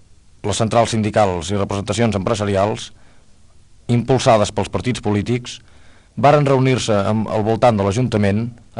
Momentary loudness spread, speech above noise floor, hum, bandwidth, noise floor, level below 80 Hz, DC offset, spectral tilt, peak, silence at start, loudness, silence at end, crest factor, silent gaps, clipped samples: 10 LU; 29 dB; none; 11 kHz; -46 dBFS; -44 dBFS; under 0.1%; -6 dB/octave; -2 dBFS; 0.45 s; -17 LUFS; 0 s; 16 dB; none; under 0.1%